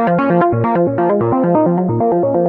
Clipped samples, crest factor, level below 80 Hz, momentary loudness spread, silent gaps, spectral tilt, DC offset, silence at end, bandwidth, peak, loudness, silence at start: under 0.1%; 12 dB; -50 dBFS; 2 LU; none; -11.5 dB/octave; under 0.1%; 0 s; 4.3 kHz; 0 dBFS; -14 LUFS; 0 s